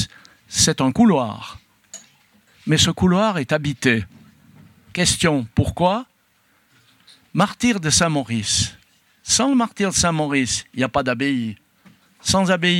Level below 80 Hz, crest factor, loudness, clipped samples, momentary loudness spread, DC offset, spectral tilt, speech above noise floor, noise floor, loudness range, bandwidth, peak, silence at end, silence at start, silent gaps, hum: -46 dBFS; 20 dB; -19 LUFS; under 0.1%; 14 LU; under 0.1%; -3.5 dB/octave; 42 dB; -61 dBFS; 3 LU; 16.5 kHz; -2 dBFS; 0 s; 0 s; none; none